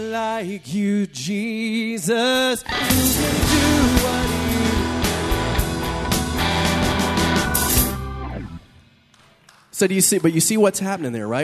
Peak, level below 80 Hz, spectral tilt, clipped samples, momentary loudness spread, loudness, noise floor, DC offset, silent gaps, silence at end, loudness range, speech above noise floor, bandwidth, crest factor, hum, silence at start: 0 dBFS; -32 dBFS; -4 dB/octave; under 0.1%; 9 LU; -19 LUFS; -54 dBFS; under 0.1%; none; 0 s; 3 LU; 34 dB; 14 kHz; 20 dB; none; 0 s